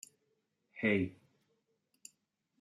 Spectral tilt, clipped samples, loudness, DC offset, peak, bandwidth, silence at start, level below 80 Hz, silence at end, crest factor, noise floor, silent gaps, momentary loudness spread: -6 dB/octave; under 0.1%; -35 LUFS; under 0.1%; -20 dBFS; 14.5 kHz; 0.75 s; -78 dBFS; 1.5 s; 20 dB; -81 dBFS; none; 25 LU